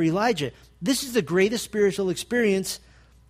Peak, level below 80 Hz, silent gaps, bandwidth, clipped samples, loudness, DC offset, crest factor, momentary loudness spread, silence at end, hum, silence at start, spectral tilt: -8 dBFS; -56 dBFS; none; 15.5 kHz; under 0.1%; -24 LUFS; under 0.1%; 16 dB; 9 LU; 0.55 s; none; 0 s; -4.5 dB/octave